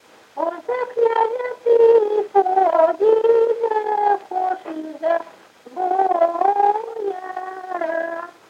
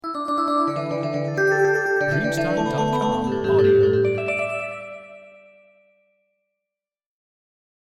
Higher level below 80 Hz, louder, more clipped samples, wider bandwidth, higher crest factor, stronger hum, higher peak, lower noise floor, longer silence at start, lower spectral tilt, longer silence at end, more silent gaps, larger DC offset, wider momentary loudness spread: second, -80 dBFS vs -54 dBFS; about the same, -19 LUFS vs -21 LUFS; neither; second, 7.4 kHz vs 12.5 kHz; about the same, 16 dB vs 16 dB; neither; first, -4 dBFS vs -8 dBFS; second, -44 dBFS vs -87 dBFS; first, 0.35 s vs 0.05 s; second, -4.5 dB/octave vs -6.5 dB/octave; second, 0.2 s vs 2.6 s; neither; neither; first, 13 LU vs 10 LU